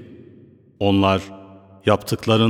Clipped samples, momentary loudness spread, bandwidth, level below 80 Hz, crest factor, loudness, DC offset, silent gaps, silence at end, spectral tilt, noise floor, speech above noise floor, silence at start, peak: under 0.1%; 7 LU; 16.5 kHz; -56 dBFS; 20 dB; -20 LUFS; under 0.1%; none; 0 s; -6.5 dB/octave; -48 dBFS; 31 dB; 0 s; -2 dBFS